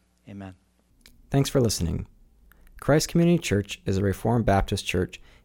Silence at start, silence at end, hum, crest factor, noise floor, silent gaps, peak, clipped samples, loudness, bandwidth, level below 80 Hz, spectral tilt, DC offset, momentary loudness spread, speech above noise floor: 0.25 s; 0.3 s; none; 16 dB; -57 dBFS; none; -10 dBFS; under 0.1%; -25 LUFS; 17.5 kHz; -42 dBFS; -5.5 dB/octave; under 0.1%; 20 LU; 33 dB